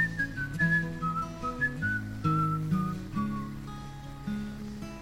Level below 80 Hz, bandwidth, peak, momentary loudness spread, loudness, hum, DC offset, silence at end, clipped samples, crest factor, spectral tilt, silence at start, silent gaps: -48 dBFS; 16 kHz; -16 dBFS; 13 LU; -31 LUFS; none; under 0.1%; 0 s; under 0.1%; 16 dB; -7 dB/octave; 0 s; none